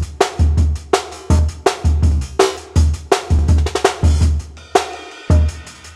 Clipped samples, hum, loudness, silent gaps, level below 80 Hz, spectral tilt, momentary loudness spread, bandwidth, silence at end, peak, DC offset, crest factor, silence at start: under 0.1%; none; -17 LUFS; none; -18 dBFS; -5.5 dB/octave; 5 LU; 12 kHz; 0 s; 0 dBFS; under 0.1%; 16 dB; 0 s